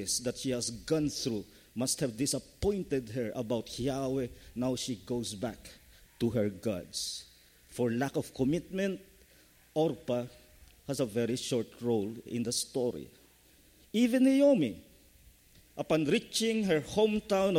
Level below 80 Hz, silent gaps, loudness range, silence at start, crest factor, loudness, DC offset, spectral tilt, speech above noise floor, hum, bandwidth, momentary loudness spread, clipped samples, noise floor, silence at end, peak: -58 dBFS; none; 6 LU; 0 s; 18 dB; -32 LUFS; under 0.1%; -4.5 dB/octave; 30 dB; none; 16.5 kHz; 11 LU; under 0.1%; -62 dBFS; 0 s; -14 dBFS